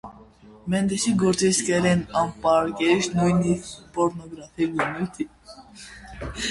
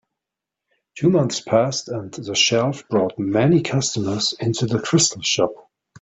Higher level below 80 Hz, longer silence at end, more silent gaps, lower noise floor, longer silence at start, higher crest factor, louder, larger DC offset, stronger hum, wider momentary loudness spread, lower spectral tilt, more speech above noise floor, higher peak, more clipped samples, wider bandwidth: first, -48 dBFS vs -58 dBFS; second, 0 s vs 0.45 s; neither; second, -49 dBFS vs -85 dBFS; second, 0.05 s vs 0.95 s; about the same, 16 dB vs 18 dB; second, -23 LUFS vs -20 LUFS; neither; neither; first, 18 LU vs 6 LU; about the same, -5 dB/octave vs -4 dB/octave; second, 26 dB vs 65 dB; second, -8 dBFS vs -2 dBFS; neither; first, 11.5 kHz vs 8.4 kHz